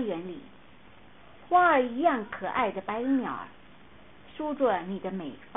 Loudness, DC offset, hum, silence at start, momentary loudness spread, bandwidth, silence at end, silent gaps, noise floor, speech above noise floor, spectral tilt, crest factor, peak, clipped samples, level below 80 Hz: -28 LUFS; 0.2%; none; 0 s; 17 LU; 3.9 kHz; 0.1 s; none; -55 dBFS; 27 dB; -9.5 dB/octave; 18 dB; -12 dBFS; under 0.1%; -62 dBFS